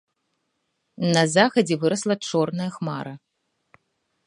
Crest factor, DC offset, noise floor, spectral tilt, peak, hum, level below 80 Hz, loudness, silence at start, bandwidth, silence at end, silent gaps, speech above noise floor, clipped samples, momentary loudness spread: 22 dB; under 0.1%; -75 dBFS; -5 dB/octave; -2 dBFS; none; -70 dBFS; -22 LUFS; 1 s; 11 kHz; 1.1 s; none; 53 dB; under 0.1%; 12 LU